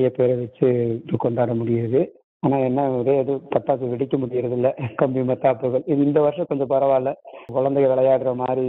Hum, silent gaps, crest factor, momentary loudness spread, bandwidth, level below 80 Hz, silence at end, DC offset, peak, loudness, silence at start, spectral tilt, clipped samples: none; 2.24-2.40 s; 18 dB; 5 LU; 4 kHz; -60 dBFS; 0 s; under 0.1%; -2 dBFS; -21 LUFS; 0 s; -11.5 dB/octave; under 0.1%